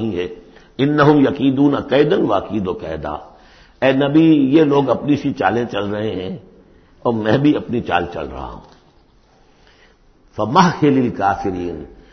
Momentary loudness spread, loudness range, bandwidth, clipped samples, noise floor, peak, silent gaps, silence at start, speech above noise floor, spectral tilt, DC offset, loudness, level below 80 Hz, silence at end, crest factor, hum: 16 LU; 5 LU; 6.4 kHz; under 0.1%; -52 dBFS; 0 dBFS; none; 0 s; 36 dB; -7.5 dB/octave; under 0.1%; -16 LUFS; -44 dBFS; 0.2 s; 16 dB; none